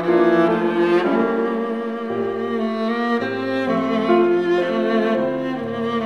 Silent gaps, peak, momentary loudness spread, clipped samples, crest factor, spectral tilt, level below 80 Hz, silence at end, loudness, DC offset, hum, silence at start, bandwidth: none; -4 dBFS; 8 LU; under 0.1%; 16 dB; -7 dB/octave; -64 dBFS; 0 s; -20 LUFS; 0.2%; none; 0 s; 6.6 kHz